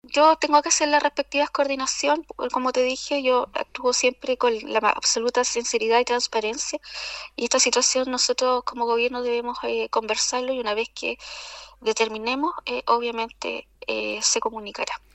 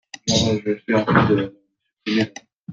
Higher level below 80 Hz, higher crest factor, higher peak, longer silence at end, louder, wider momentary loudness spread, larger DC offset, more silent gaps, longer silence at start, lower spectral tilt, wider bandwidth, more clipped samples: second, -58 dBFS vs -52 dBFS; about the same, 20 dB vs 18 dB; about the same, -4 dBFS vs -2 dBFS; first, 0.15 s vs 0 s; second, -23 LUFS vs -20 LUFS; second, 11 LU vs 14 LU; neither; second, none vs 2.58-2.65 s; second, 0.05 s vs 0.25 s; second, -0.5 dB/octave vs -5 dB/octave; first, 11.5 kHz vs 8.8 kHz; neither